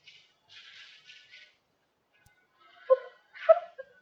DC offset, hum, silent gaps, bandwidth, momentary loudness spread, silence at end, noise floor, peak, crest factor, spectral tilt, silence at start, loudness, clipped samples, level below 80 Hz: under 0.1%; none; none; 6.6 kHz; 26 LU; 0.35 s; -75 dBFS; -8 dBFS; 24 dB; -1.5 dB/octave; 2.9 s; -27 LUFS; under 0.1%; -86 dBFS